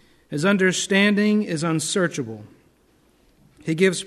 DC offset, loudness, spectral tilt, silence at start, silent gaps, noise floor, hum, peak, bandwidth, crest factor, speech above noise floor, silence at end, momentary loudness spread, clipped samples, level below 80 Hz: under 0.1%; -21 LUFS; -4.5 dB/octave; 0.3 s; none; -60 dBFS; none; -4 dBFS; 13 kHz; 18 dB; 39 dB; 0 s; 15 LU; under 0.1%; -64 dBFS